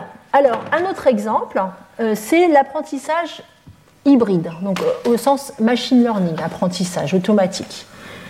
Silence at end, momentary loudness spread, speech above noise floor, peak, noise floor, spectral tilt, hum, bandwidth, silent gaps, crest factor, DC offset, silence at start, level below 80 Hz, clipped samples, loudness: 0 s; 10 LU; 29 dB; -2 dBFS; -46 dBFS; -5.5 dB/octave; none; 16 kHz; none; 16 dB; under 0.1%; 0 s; -58 dBFS; under 0.1%; -18 LUFS